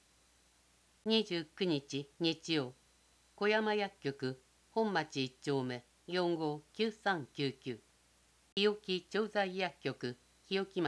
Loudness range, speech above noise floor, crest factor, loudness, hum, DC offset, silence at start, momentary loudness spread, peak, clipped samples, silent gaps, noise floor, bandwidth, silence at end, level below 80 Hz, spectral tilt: 2 LU; 33 dB; 20 dB; -37 LUFS; 60 Hz at -70 dBFS; under 0.1%; 1.05 s; 11 LU; -18 dBFS; under 0.1%; 8.52-8.56 s; -69 dBFS; 11 kHz; 0 s; -76 dBFS; -5 dB/octave